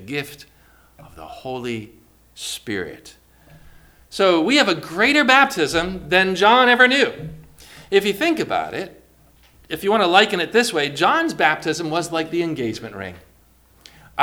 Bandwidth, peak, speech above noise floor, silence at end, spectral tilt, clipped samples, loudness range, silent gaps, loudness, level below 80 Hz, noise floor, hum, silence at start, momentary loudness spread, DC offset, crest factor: over 20 kHz; 0 dBFS; 35 dB; 0 s; -3.5 dB/octave; under 0.1%; 15 LU; none; -18 LUFS; -52 dBFS; -54 dBFS; none; 0 s; 19 LU; under 0.1%; 20 dB